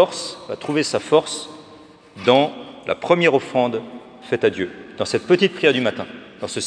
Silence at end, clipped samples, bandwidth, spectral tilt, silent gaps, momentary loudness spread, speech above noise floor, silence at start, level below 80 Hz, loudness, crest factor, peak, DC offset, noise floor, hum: 0 s; under 0.1%; 10.5 kHz; -4.5 dB/octave; none; 16 LU; 25 dB; 0 s; -64 dBFS; -20 LUFS; 20 dB; 0 dBFS; under 0.1%; -45 dBFS; none